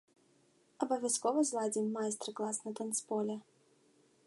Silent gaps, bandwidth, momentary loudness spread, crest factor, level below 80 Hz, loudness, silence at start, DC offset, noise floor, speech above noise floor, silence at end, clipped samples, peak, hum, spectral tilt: none; 12 kHz; 7 LU; 20 dB; -90 dBFS; -36 LUFS; 0.8 s; under 0.1%; -70 dBFS; 34 dB; 0.85 s; under 0.1%; -18 dBFS; none; -3.5 dB/octave